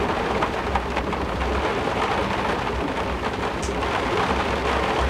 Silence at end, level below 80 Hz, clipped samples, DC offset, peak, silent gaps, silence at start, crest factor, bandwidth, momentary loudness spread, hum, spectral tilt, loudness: 0 s; -34 dBFS; under 0.1%; under 0.1%; -6 dBFS; none; 0 s; 16 dB; 15 kHz; 3 LU; none; -5 dB/octave; -24 LUFS